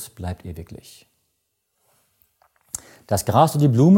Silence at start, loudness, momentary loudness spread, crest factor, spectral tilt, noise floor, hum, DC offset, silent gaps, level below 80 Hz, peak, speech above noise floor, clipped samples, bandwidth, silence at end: 0 s; -21 LUFS; 22 LU; 20 dB; -7 dB/octave; -73 dBFS; none; under 0.1%; none; -50 dBFS; -2 dBFS; 55 dB; under 0.1%; 17 kHz; 0 s